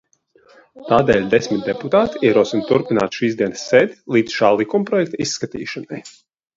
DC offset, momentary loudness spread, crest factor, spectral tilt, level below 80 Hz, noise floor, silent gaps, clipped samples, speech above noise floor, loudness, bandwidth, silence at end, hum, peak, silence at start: under 0.1%; 12 LU; 18 dB; -5 dB/octave; -52 dBFS; -54 dBFS; none; under 0.1%; 37 dB; -18 LUFS; 7.8 kHz; 0.45 s; none; 0 dBFS; 0.75 s